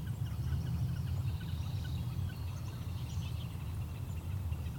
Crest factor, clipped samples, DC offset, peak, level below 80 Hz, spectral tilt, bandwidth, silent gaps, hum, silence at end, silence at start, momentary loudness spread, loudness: 12 dB; under 0.1%; under 0.1%; -26 dBFS; -44 dBFS; -6.5 dB/octave; 19 kHz; none; none; 0 s; 0 s; 5 LU; -39 LUFS